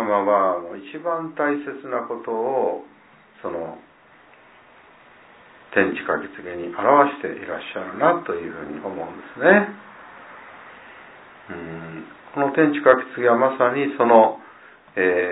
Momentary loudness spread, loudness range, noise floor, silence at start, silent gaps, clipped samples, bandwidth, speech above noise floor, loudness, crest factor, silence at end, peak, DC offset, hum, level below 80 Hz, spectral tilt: 22 LU; 10 LU; -51 dBFS; 0 s; none; under 0.1%; 4 kHz; 31 dB; -21 LUFS; 22 dB; 0 s; 0 dBFS; under 0.1%; none; -66 dBFS; -10 dB/octave